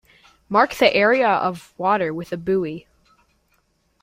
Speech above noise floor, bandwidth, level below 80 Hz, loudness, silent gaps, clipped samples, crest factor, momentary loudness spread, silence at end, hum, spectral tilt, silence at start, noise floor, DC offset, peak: 46 dB; 16 kHz; -58 dBFS; -20 LUFS; none; under 0.1%; 20 dB; 11 LU; 1.25 s; none; -5.5 dB/octave; 0.5 s; -65 dBFS; under 0.1%; -2 dBFS